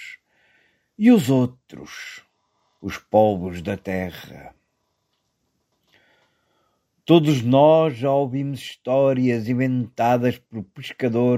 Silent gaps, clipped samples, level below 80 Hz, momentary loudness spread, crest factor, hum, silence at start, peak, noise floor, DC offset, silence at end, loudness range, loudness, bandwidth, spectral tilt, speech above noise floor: none; under 0.1%; -60 dBFS; 20 LU; 20 dB; none; 0 s; -2 dBFS; -73 dBFS; under 0.1%; 0 s; 9 LU; -20 LUFS; 15.5 kHz; -7.5 dB/octave; 53 dB